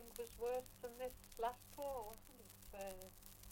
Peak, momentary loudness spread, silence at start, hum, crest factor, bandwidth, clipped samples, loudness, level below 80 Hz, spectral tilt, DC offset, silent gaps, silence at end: -30 dBFS; 14 LU; 0 s; none; 20 dB; 17 kHz; under 0.1%; -49 LUFS; -64 dBFS; -3.5 dB/octave; under 0.1%; none; 0 s